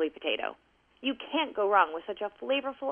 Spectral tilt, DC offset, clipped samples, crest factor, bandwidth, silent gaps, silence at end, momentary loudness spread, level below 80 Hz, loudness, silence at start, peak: -5.5 dB/octave; under 0.1%; under 0.1%; 22 dB; 3.8 kHz; none; 0 s; 11 LU; -72 dBFS; -30 LUFS; 0 s; -10 dBFS